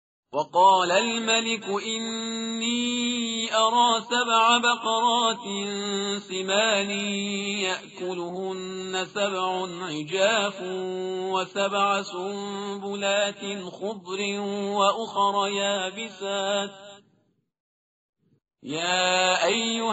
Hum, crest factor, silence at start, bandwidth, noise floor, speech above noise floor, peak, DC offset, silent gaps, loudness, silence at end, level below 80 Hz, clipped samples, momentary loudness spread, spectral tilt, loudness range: none; 20 dB; 0.3 s; 8 kHz; -69 dBFS; 43 dB; -6 dBFS; under 0.1%; 17.60-18.13 s; -25 LUFS; 0 s; -74 dBFS; under 0.1%; 12 LU; -1 dB/octave; 6 LU